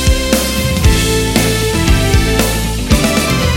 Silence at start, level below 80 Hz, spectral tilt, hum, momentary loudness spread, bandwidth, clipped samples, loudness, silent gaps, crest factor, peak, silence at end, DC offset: 0 s; -16 dBFS; -4.5 dB/octave; none; 2 LU; 17 kHz; under 0.1%; -13 LUFS; none; 12 dB; 0 dBFS; 0 s; under 0.1%